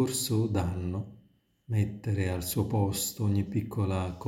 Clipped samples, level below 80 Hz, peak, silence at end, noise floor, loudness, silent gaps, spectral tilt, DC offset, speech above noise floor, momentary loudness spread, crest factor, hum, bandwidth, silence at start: under 0.1%; -52 dBFS; -14 dBFS; 0 s; -63 dBFS; -30 LUFS; none; -5.5 dB/octave; under 0.1%; 33 dB; 6 LU; 16 dB; none; 17 kHz; 0 s